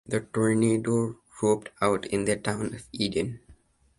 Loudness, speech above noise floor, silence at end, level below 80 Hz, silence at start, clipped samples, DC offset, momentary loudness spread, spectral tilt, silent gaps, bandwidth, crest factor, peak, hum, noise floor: -27 LUFS; 31 dB; 0.45 s; -56 dBFS; 0.1 s; under 0.1%; under 0.1%; 10 LU; -5.5 dB/octave; none; 11.5 kHz; 20 dB; -8 dBFS; none; -57 dBFS